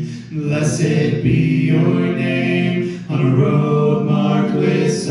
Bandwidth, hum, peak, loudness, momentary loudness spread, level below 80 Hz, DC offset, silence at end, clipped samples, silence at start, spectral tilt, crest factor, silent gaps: 11.5 kHz; none; -4 dBFS; -16 LUFS; 5 LU; -46 dBFS; under 0.1%; 0 s; under 0.1%; 0 s; -7 dB/octave; 12 dB; none